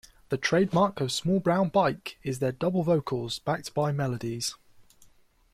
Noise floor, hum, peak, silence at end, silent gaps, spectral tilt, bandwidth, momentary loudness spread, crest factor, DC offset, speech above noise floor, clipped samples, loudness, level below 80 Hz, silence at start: -59 dBFS; none; -12 dBFS; 0.7 s; none; -5.5 dB/octave; 15 kHz; 8 LU; 16 dB; under 0.1%; 32 dB; under 0.1%; -27 LUFS; -60 dBFS; 0.3 s